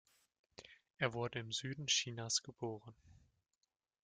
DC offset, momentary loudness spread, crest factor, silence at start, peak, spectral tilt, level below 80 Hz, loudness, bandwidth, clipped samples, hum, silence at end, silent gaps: under 0.1%; 21 LU; 24 dB; 0.6 s; -20 dBFS; -2.5 dB/octave; -76 dBFS; -39 LUFS; 11 kHz; under 0.1%; none; 0.9 s; none